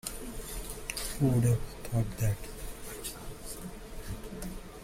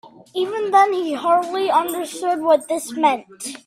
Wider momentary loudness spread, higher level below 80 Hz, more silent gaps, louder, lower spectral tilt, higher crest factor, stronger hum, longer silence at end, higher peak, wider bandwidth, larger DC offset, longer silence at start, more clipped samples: first, 15 LU vs 10 LU; first, -44 dBFS vs -70 dBFS; neither; second, -35 LUFS vs -19 LUFS; first, -5.5 dB/octave vs -2.5 dB/octave; about the same, 18 dB vs 16 dB; neither; about the same, 0 s vs 0.1 s; second, -16 dBFS vs -2 dBFS; about the same, 16.5 kHz vs 16 kHz; neither; about the same, 0.05 s vs 0.05 s; neither